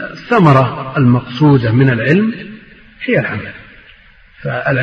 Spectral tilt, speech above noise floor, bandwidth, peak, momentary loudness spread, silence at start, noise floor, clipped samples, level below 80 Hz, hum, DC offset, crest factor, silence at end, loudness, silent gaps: -9 dB/octave; 31 dB; 6.4 kHz; 0 dBFS; 16 LU; 0 s; -43 dBFS; under 0.1%; -46 dBFS; none; under 0.1%; 14 dB; 0 s; -13 LUFS; none